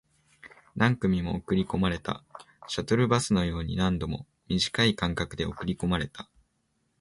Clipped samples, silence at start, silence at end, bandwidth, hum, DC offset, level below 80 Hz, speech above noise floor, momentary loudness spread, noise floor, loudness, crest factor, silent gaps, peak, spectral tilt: under 0.1%; 0.45 s; 0.75 s; 11.5 kHz; none; under 0.1%; -46 dBFS; 47 dB; 14 LU; -74 dBFS; -28 LUFS; 20 dB; none; -8 dBFS; -5.5 dB/octave